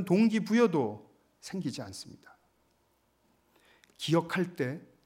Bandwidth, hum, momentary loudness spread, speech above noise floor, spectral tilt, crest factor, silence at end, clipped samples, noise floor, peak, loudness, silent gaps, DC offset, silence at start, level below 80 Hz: 15.5 kHz; none; 20 LU; 42 dB; -6 dB/octave; 18 dB; 0.2 s; under 0.1%; -72 dBFS; -14 dBFS; -30 LUFS; none; under 0.1%; 0 s; -76 dBFS